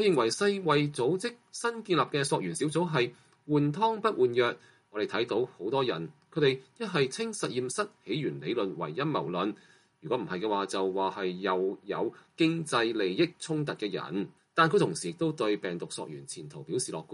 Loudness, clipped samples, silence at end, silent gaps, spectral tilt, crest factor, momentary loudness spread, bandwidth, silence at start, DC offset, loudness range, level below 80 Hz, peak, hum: -30 LUFS; under 0.1%; 0 s; none; -5 dB/octave; 20 dB; 9 LU; 11.5 kHz; 0 s; under 0.1%; 3 LU; -74 dBFS; -10 dBFS; none